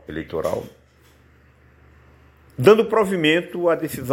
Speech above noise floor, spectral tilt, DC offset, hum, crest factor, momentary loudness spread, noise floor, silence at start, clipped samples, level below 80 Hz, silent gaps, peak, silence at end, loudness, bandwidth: 34 dB; -5.5 dB/octave; under 0.1%; none; 20 dB; 14 LU; -54 dBFS; 0.1 s; under 0.1%; -52 dBFS; none; 0 dBFS; 0 s; -19 LUFS; 16.5 kHz